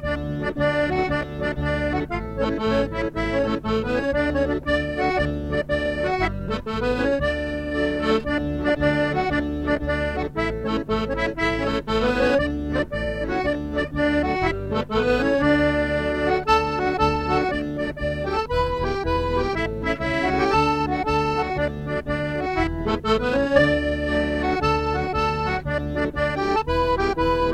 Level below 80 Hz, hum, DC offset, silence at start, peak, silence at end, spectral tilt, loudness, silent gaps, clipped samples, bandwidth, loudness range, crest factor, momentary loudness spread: -34 dBFS; none; under 0.1%; 0 s; -6 dBFS; 0 s; -6.5 dB/octave; -23 LUFS; none; under 0.1%; 12.5 kHz; 2 LU; 18 dB; 6 LU